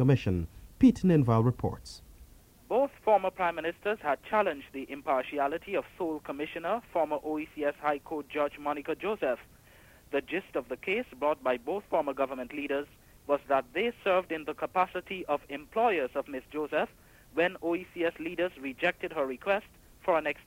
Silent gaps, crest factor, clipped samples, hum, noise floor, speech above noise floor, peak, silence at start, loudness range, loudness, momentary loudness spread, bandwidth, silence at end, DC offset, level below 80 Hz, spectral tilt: none; 20 dB; under 0.1%; none; -57 dBFS; 27 dB; -12 dBFS; 0 s; 4 LU; -31 LUFS; 10 LU; 16 kHz; 0.05 s; under 0.1%; -56 dBFS; -7.5 dB/octave